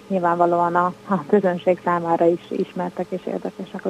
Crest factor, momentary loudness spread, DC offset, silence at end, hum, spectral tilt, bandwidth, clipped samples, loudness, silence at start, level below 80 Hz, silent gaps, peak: 16 dB; 10 LU; under 0.1%; 0 s; none; -8 dB/octave; 10.5 kHz; under 0.1%; -21 LUFS; 0.1 s; -68 dBFS; none; -4 dBFS